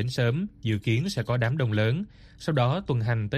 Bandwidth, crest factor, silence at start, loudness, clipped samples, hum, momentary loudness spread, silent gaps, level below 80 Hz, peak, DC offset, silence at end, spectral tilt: 13 kHz; 14 dB; 0 s; -27 LUFS; under 0.1%; none; 5 LU; none; -52 dBFS; -12 dBFS; under 0.1%; 0 s; -7 dB/octave